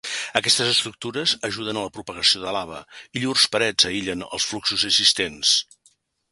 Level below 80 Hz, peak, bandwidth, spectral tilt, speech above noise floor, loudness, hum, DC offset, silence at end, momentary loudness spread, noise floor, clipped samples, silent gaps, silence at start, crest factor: -56 dBFS; 0 dBFS; 12 kHz; -1.5 dB/octave; 39 dB; -20 LUFS; none; under 0.1%; 0.7 s; 12 LU; -62 dBFS; under 0.1%; none; 0.05 s; 24 dB